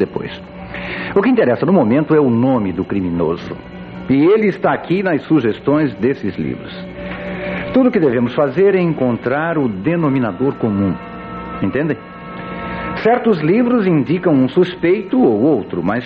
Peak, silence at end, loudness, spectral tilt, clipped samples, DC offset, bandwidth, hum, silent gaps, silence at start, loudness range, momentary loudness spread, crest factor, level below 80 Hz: -2 dBFS; 0 s; -16 LUFS; -9.5 dB/octave; under 0.1%; under 0.1%; 5.6 kHz; none; none; 0 s; 3 LU; 14 LU; 14 dB; -44 dBFS